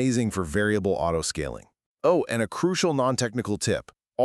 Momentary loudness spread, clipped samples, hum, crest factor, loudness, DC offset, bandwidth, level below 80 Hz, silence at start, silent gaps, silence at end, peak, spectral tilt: 8 LU; under 0.1%; none; 16 dB; -25 LUFS; under 0.1%; 13.5 kHz; -48 dBFS; 0 s; 1.86-1.95 s; 0 s; -10 dBFS; -5 dB/octave